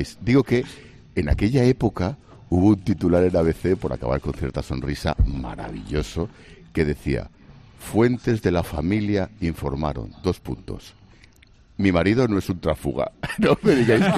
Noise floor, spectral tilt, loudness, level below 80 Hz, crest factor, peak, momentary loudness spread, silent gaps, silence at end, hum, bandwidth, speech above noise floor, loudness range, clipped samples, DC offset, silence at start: -52 dBFS; -7.5 dB/octave; -23 LUFS; -36 dBFS; 18 dB; -4 dBFS; 12 LU; none; 0 s; none; 14 kHz; 31 dB; 6 LU; under 0.1%; under 0.1%; 0 s